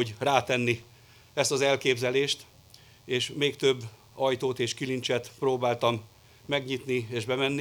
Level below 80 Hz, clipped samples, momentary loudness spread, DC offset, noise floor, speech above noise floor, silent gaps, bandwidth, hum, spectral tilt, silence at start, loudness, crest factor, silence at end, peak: -68 dBFS; under 0.1%; 7 LU; under 0.1%; -55 dBFS; 27 dB; none; over 20 kHz; none; -4 dB/octave; 0 s; -28 LUFS; 22 dB; 0 s; -6 dBFS